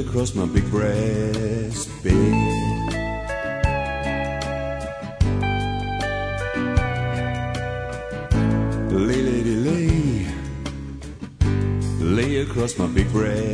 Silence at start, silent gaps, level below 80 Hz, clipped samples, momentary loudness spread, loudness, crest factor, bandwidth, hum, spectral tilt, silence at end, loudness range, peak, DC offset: 0 s; none; -32 dBFS; under 0.1%; 9 LU; -23 LUFS; 18 dB; 11 kHz; none; -6.5 dB/octave; 0 s; 2 LU; -4 dBFS; under 0.1%